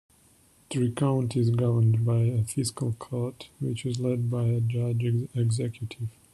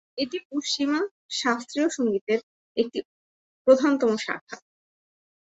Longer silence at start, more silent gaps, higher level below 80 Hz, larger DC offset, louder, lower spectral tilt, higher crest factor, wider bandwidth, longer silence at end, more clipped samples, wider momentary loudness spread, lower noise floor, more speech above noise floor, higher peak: first, 0.7 s vs 0.15 s; second, none vs 0.45-0.50 s, 1.11-1.29 s, 2.21-2.27 s, 2.43-2.75 s, 3.05-3.65 s, 4.41-4.47 s; first, -60 dBFS vs -72 dBFS; neither; about the same, -27 LUFS vs -25 LUFS; first, -7 dB/octave vs -3.5 dB/octave; second, 14 dB vs 22 dB; first, 12 kHz vs 8.2 kHz; second, 0.25 s vs 0.95 s; neither; about the same, 11 LU vs 13 LU; second, -60 dBFS vs under -90 dBFS; second, 34 dB vs over 66 dB; second, -12 dBFS vs -6 dBFS